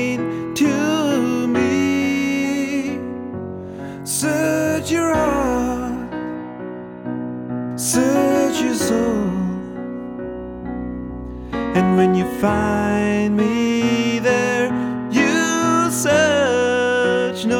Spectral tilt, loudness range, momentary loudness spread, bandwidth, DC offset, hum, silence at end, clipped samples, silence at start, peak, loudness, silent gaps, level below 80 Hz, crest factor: -4.5 dB/octave; 5 LU; 13 LU; 18.5 kHz; under 0.1%; none; 0 s; under 0.1%; 0 s; -4 dBFS; -19 LUFS; none; -42 dBFS; 14 dB